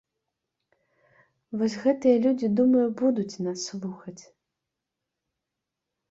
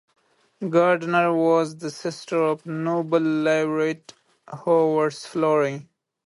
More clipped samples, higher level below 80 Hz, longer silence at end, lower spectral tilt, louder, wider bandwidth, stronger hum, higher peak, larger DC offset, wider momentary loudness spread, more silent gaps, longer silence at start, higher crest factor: neither; about the same, -72 dBFS vs -72 dBFS; first, 1.9 s vs 0.45 s; about the same, -6 dB/octave vs -6 dB/octave; second, -25 LUFS vs -22 LUFS; second, 7.8 kHz vs 11.5 kHz; neither; second, -10 dBFS vs -6 dBFS; neither; first, 16 LU vs 12 LU; neither; first, 1.5 s vs 0.6 s; about the same, 18 dB vs 16 dB